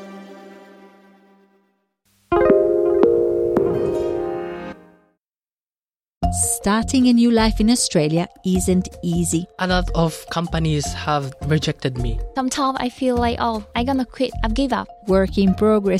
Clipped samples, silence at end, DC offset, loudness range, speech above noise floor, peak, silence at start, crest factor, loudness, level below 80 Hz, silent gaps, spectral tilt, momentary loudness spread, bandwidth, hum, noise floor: under 0.1%; 0 s; under 0.1%; 4 LU; over 71 dB; -2 dBFS; 0 s; 18 dB; -19 LUFS; -34 dBFS; 6.17-6.21 s; -5 dB/octave; 9 LU; 14 kHz; none; under -90 dBFS